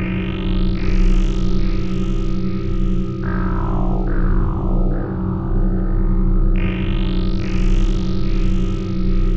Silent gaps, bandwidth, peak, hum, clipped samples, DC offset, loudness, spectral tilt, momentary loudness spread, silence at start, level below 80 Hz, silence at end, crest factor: none; 6.4 kHz; -4 dBFS; none; under 0.1%; under 0.1%; -21 LUFS; -8 dB/octave; 3 LU; 0 s; -18 dBFS; 0 s; 12 dB